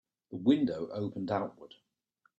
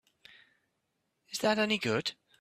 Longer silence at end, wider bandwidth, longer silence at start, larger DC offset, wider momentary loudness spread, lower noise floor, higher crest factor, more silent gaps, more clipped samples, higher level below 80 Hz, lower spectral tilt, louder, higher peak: first, 0.75 s vs 0.25 s; second, 7.8 kHz vs 15 kHz; second, 0.3 s vs 1.3 s; neither; about the same, 12 LU vs 10 LU; second, -74 dBFS vs -81 dBFS; about the same, 20 dB vs 22 dB; neither; neither; about the same, -74 dBFS vs -74 dBFS; first, -8 dB/octave vs -4 dB/octave; about the same, -32 LUFS vs -31 LUFS; about the same, -14 dBFS vs -14 dBFS